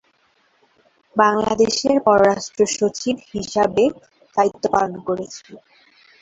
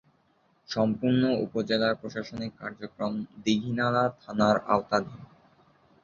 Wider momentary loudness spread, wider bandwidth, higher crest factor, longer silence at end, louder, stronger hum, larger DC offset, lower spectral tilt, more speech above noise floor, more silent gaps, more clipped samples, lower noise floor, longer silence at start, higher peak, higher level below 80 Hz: about the same, 11 LU vs 12 LU; first, 8.2 kHz vs 7.4 kHz; about the same, 18 dB vs 20 dB; second, 0.65 s vs 0.8 s; first, -19 LUFS vs -28 LUFS; neither; neither; second, -4 dB/octave vs -6 dB/octave; about the same, 43 dB vs 40 dB; neither; neither; second, -61 dBFS vs -67 dBFS; first, 1.15 s vs 0.7 s; first, -2 dBFS vs -8 dBFS; first, -54 dBFS vs -62 dBFS